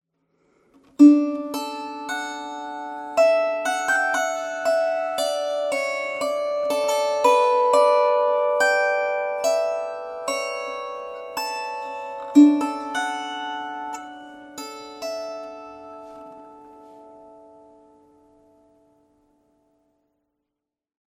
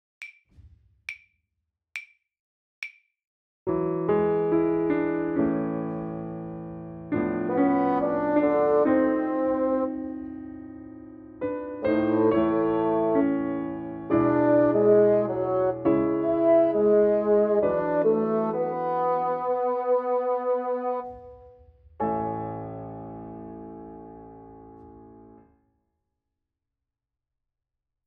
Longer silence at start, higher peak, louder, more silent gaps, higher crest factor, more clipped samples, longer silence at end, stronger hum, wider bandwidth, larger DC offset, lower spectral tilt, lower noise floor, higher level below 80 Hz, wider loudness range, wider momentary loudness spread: first, 1 s vs 0.2 s; first, -4 dBFS vs -8 dBFS; about the same, -22 LUFS vs -24 LUFS; second, none vs 2.39-2.82 s, 3.27-3.66 s; about the same, 20 dB vs 16 dB; neither; first, 3.85 s vs 2.85 s; neither; first, 16 kHz vs 6 kHz; neither; second, -2.5 dB/octave vs -9.5 dB/octave; about the same, -84 dBFS vs -87 dBFS; second, -72 dBFS vs -58 dBFS; about the same, 16 LU vs 14 LU; about the same, 19 LU vs 20 LU